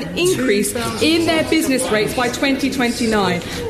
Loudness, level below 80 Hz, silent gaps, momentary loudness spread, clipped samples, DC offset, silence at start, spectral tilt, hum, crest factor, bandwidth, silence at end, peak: -17 LUFS; -42 dBFS; none; 3 LU; under 0.1%; under 0.1%; 0 s; -4 dB/octave; none; 14 dB; 14 kHz; 0 s; -4 dBFS